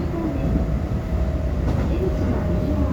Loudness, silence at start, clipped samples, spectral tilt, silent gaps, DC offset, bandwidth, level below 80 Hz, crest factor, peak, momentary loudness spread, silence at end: -23 LUFS; 0 s; under 0.1%; -9 dB/octave; none; under 0.1%; 7.8 kHz; -26 dBFS; 12 dB; -8 dBFS; 2 LU; 0 s